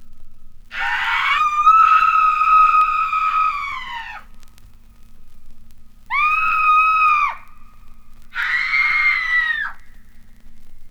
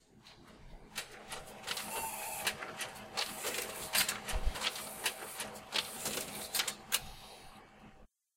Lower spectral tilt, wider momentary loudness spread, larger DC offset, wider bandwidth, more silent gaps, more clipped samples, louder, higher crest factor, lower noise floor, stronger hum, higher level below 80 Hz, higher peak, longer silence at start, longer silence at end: about the same, -0.5 dB/octave vs -1 dB/octave; second, 16 LU vs 21 LU; neither; second, 13 kHz vs 16.5 kHz; neither; neither; first, -15 LUFS vs -37 LUFS; second, 16 dB vs 26 dB; second, -41 dBFS vs -60 dBFS; first, 50 Hz at -60 dBFS vs none; first, -40 dBFS vs -50 dBFS; first, -4 dBFS vs -14 dBFS; second, 0 s vs 0.15 s; second, 0 s vs 0.3 s